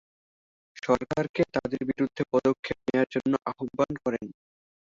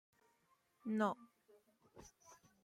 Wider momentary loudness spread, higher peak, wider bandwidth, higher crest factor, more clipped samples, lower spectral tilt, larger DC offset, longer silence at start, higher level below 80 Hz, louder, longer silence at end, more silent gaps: second, 7 LU vs 24 LU; first, -10 dBFS vs -26 dBFS; second, 7.6 kHz vs 13 kHz; about the same, 20 dB vs 22 dB; neither; about the same, -7 dB/octave vs -6 dB/octave; neither; about the same, 0.85 s vs 0.85 s; first, -58 dBFS vs -82 dBFS; first, -28 LUFS vs -42 LUFS; first, 0.65 s vs 0.3 s; first, 1.29-1.34 s, 2.59-2.63 s vs none